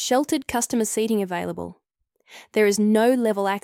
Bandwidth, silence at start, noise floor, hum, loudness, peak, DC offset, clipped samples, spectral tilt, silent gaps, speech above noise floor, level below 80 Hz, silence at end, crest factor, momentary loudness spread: 16.5 kHz; 0 s; -66 dBFS; none; -22 LUFS; -8 dBFS; under 0.1%; under 0.1%; -4 dB/octave; none; 44 dB; -58 dBFS; 0.05 s; 14 dB; 11 LU